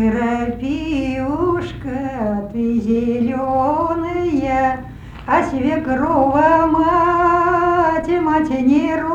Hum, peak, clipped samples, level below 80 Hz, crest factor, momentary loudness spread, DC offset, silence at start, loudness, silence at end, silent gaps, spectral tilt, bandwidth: none; -2 dBFS; under 0.1%; -38 dBFS; 16 dB; 8 LU; under 0.1%; 0 s; -17 LUFS; 0 s; none; -7.5 dB/octave; 8.8 kHz